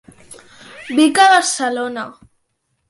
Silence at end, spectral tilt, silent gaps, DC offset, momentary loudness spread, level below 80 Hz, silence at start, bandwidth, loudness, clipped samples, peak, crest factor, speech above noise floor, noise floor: 0.8 s; -1.5 dB/octave; none; under 0.1%; 20 LU; -62 dBFS; 0.3 s; 11.5 kHz; -14 LUFS; under 0.1%; -2 dBFS; 16 dB; 54 dB; -69 dBFS